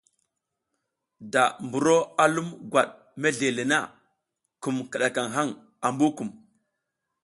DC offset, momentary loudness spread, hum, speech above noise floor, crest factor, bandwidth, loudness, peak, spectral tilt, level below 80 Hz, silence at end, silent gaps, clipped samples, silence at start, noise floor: under 0.1%; 9 LU; none; 57 dB; 22 dB; 11.5 kHz; -25 LUFS; -6 dBFS; -4 dB/octave; -72 dBFS; 0.9 s; none; under 0.1%; 1.2 s; -82 dBFS